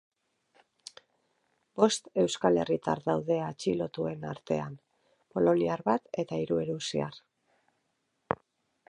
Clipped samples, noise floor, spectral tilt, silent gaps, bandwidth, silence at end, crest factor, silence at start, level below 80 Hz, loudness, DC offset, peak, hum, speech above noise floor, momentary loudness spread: under 0.1%; -78 dBFS; -5.5 dB/octave; none; 11.5 kHz; 0.55 s; 24 dB; 1.75 s; -66 dBFS; -30 LUFS; under 0.1%; -8 dBFS; none; 49 dB; 13 LU